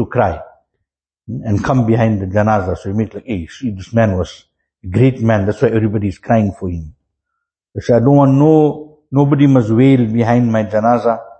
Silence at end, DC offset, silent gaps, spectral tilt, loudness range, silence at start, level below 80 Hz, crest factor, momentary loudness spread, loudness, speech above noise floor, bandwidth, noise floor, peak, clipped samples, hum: 0.05 s; under 0.1%; none; -9 dB/octave; 5 LU; 0 s; -40 dBFS; 14 dB; 14 LU; -14 LUFS; 63 dB; 8.4 kHz; -77 dBFS; 0 dBFS; under 0.1%; none